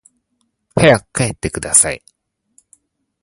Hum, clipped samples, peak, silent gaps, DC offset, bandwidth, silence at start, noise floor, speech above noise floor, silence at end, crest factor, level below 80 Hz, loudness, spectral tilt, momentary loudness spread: none; under 0.1%; 0 dBFS; none; under 0.1%; 16 kHz; 0.75 s; -68 dBFS; 54 dB; 1.25 s; 18 dB; -42 dBFS; -14 LUFS; -3.5 dB/octave; 12 LU